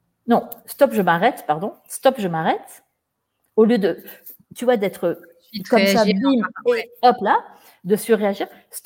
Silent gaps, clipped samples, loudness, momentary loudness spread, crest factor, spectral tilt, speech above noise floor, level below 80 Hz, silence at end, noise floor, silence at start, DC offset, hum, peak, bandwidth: none; under 0.1%; -19 LUFS; 16 LU; 20 dB; -5.5 dB/octave; 56 dB; -66 dBFS; 0.05 s; -75 dBFS; 0.25 s; under 0.1%; none; -2 dBFS; 17 kHz